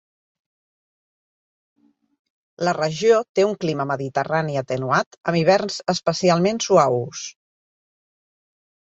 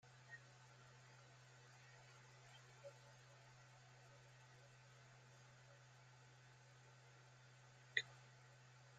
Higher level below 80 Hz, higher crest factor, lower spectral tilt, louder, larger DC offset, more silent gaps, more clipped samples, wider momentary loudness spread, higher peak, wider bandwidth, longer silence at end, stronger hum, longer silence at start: first, -64 dBFS vs -88 dBFS; second, 20 dB vs 36 dB; first, -5 dB/octave vs -2.5 dB/octave; first, -20 LUFS vs -58 LUFS; neither; first, 3.29-3.34 s, 5.07-5.11 s, 5.17-5.21 s vs none; neither; about the same, 8 LU vs 7 LU; first, -2 dBFS vs -24 dBFS; about the same, 8.2 kHz vs 9 kHz; first, 1.7 s vs 0 s; neither; first, 2.6 s vs 0 s